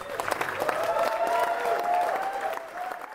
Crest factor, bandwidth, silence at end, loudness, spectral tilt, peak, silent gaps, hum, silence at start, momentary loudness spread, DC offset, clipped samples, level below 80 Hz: 20 dB; 16 kHz; 0 s; -28 LUFS; -2.5 dB/octave; -8 dBFS; none; none; 0 s; 8 LU; under 0.1%; under 0.1%; -64 dBFS